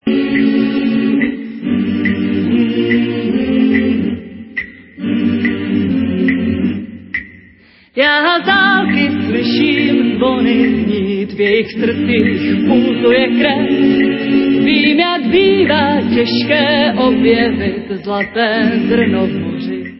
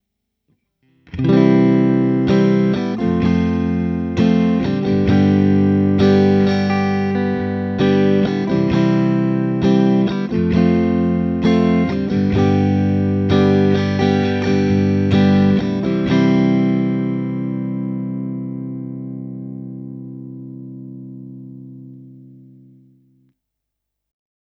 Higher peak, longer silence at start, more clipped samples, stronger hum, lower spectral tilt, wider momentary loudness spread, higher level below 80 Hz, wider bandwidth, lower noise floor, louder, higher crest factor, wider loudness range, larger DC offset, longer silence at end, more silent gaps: about the same, 0 dBFS vs 0 dBFS; second, 0.05 s vs 1.15 s; neither; second, none vs 50 Hz at -45 dBFS; first, -10 dB/octave vs -8.5 dB/octave; second, 9 LU vs 18 LU; about the same, -40 dBFS vs -44 dBFS; second, 5.8 kHz vs 6.4 kHz; second, -45 dBFS vs -79 dBFS; first, -13 LUFS vs -16 LUFS; about the same, 14 dB vs 16 dB; second, 4 LU vs 15 LU; neither; second, 0 s vs 2.35 s; neither